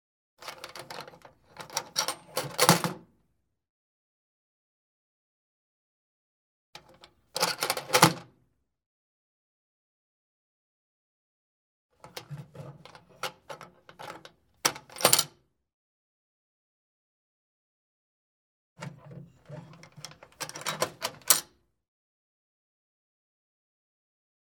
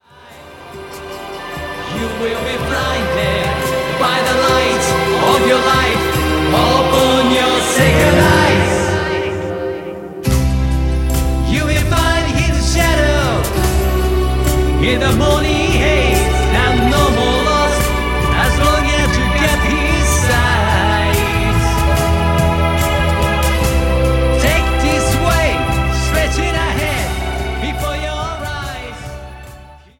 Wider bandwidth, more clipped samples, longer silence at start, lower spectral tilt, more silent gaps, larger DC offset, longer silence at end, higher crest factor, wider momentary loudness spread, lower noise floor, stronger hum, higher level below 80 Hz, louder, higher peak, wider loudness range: first, 19.5 kHz vs 16.5 kHz; neither; first, 0.4 s vs 0.25 s; second, -2 dB/octave vs -4.5 dB/octave; first, 3.69-6.73 s, 8.86-11.89 s, 15.74-18.76 s vs none; neither; first, 3.1 s vs 0.2 s; first, 36 dB vs 14 dB; first, 25 LU vs 10 LU; first, -76 dBFS vs -39 dBFS; neither; second, -74 dBFS vs -20 dBFS; second, -27 LUFS vs -14 LUFS; about the same, 0 dBFS vs 0 dBFS; first, 20 LU vs 5 LU